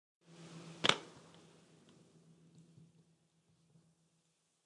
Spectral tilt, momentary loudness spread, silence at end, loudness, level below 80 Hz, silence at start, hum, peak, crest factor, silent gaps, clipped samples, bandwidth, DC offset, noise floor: -2 dB/octave; 27 LU; 3.45 s; -34 LUFS; -86 dBFS; 0.4 s; none; -8 dBFS; 38 dB; none; under 0.1%; 11.5 kHz; under 0.1%; -79 dBFS